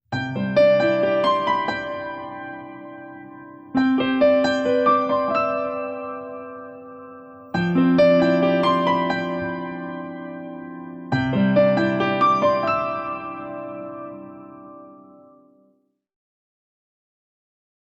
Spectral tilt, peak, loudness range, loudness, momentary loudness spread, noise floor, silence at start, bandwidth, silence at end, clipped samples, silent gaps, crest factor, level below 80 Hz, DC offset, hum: -7.5 dB/octave; -6 dBFS; 8 LU; -20 LUFS; 21 LU; -64 dBFS; 0.1 s; 8 kHz; 3.05 s; under 0.1%; none; 16 dB; -58 dBFS; under 0.1%; none